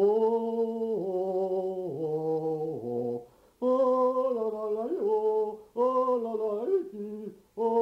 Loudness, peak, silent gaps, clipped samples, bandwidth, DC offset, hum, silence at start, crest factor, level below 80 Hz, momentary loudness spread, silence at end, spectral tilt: -29 LUFS; -16 dBFS; none; under 0.1%; 6.2 kHz; under 0.1%; none; 0 s; 12 dB; -72 dBFS; 8 LU; 0 s; -9 dB/octave